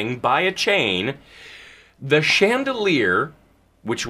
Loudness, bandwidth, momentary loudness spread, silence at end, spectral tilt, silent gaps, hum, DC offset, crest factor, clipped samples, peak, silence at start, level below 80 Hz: -19 LUFS; 15.5 kHz; 20 LU; 0 s; -4 dB/octave; none; none; under 0.1%; 18 dB; under 0.1%; -4 dBFS; 0 s; -58 dBFS